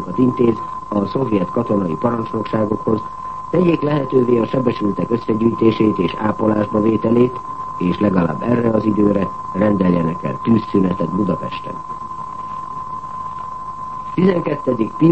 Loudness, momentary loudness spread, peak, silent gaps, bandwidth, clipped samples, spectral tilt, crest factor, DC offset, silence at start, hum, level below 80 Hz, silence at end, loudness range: -18 LUFS; 12 LU; 0 dBFS; none; 8.4 kHz; under 0.1%; -9 dB/octave; 16 dB; 1%; 0 s; none; -46 dBFS; 0 s; 6 LU